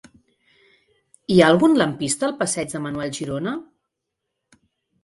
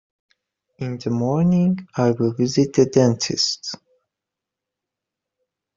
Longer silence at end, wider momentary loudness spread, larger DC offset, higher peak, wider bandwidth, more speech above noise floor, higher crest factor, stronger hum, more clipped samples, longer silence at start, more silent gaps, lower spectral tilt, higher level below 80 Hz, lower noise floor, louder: second, 1.4 s vs 2 s; about the same, 13 LU vs 13 LU; neither; about the same, 0 dBFS vs -2 dBFS; first, 11.5 kHz vs 7.6 kHz; second, 61 dB vs 66 dB; about the same, 22 dB vs 20 dB; neither; neither; first, 1.3 s vs 0.8 s; neither; second, -4.5 dB/octave vs -6 dB/octave; about the same, -58 dBFS vs -58 dBFS; second, -80 dBFS vs -85 dBFS; about the same, -20 LUFS vs -20 LUFS